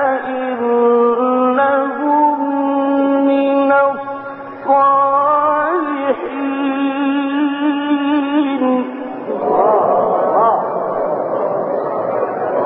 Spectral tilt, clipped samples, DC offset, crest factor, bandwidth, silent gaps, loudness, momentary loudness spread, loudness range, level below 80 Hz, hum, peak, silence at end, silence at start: -11 dB/octave; under 0.1%; under 0.1%; 12 dB; 4.1 kHz; none; -15 LUFS; 7 LU; 3 LU; -60 dBFS; none; -2 dBFS; 0 s; 0 s